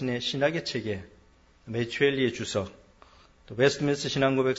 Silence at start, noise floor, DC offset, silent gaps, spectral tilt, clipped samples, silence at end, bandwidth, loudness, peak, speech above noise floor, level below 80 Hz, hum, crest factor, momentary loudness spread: 0 s; -59 dBFS; under 0.1%; none; -5 dB/octave; under 0.1%; 0 s; 8 kHz; -27 LUFS; -10 dBFS; 32 dB; -58 dBFS; none; 20 dB; 11 LU